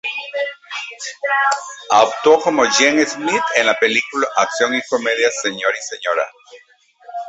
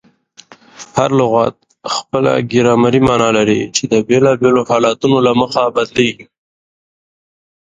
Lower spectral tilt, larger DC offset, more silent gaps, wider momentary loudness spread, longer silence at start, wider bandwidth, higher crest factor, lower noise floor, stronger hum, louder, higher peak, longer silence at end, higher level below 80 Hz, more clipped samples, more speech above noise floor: second, -1.5 dB/octave vs -5 dB/octave; neither; neither; first, 11 LU vs 8 LU; second, 0.05 s vs 0.8 s; second, 8.2 kHz vs 9.6 kHz; about the same, 16 dB vs 14 dB; about the same, -43 dBFS vs -44 dBFS; neither; second, -17 LUFS vs -13 LUFS; about the same, -2 dBFS vs 0 dBFS; second, 0 s vs 1.45 s; second, -64 dBFS vs -48 dBFS; neither; second, 27 dB vs 31 dB